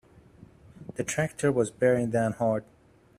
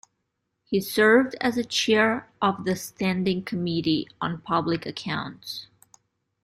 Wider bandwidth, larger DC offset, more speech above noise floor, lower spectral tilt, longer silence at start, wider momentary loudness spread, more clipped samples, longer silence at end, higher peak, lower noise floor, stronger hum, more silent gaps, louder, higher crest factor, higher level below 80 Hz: about the same, 15.5 kHz vs 16 kHz; neither; second, 27 dB vs 54 dB; first, -6 dB/octave vs -4.5 dB/octave; about the same, 0.8 s vs 0.7 s; about the same, 10 LU vs 12 LU; neither; second, 0.55 s vs 0.8 s; about the same, -10 dBFS vs -8 dBFS; second, -53 dBFS vs -78 dBFS; neither; neither; second, -27 LUFS vs -24 LUFS; about the same, 18 dB vs 18 dB; about the same, -60 dBFS vs -60 dBFS